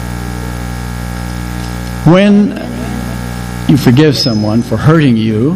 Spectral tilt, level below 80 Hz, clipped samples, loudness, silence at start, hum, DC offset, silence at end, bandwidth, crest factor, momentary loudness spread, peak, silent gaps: -6.5 dB/octave; -26 dBFS; 0.9%; -12 LUFS; 0 s; 60 Hz at -20 dBFS; under 0.1%; 0 s; 16 kHz; 12 dB; 13 LU; 0 dBFS; none